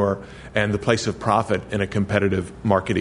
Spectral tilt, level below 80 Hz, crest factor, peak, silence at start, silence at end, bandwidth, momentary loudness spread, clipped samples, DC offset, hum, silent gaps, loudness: -6 dB/octave; -46 dBFS; 20 dB; -2 dBFS; 0 s; 0 s; 11 kHz; 4 LU; under 0.1%; under 0.1%; none; none; -22 LUFS